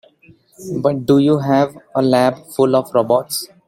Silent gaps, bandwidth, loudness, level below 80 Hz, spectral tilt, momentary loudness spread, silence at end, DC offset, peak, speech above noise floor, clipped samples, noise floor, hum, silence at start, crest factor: none; 16.5 kHz; -16 LUFS; -58 dBFS; -6 dB/octave; 7 LU; 0.2 s; under 0.1%; -2 dBFS; 34 dB; under 0.1%; -50 dBFS; none; 0.6 s; 16 dB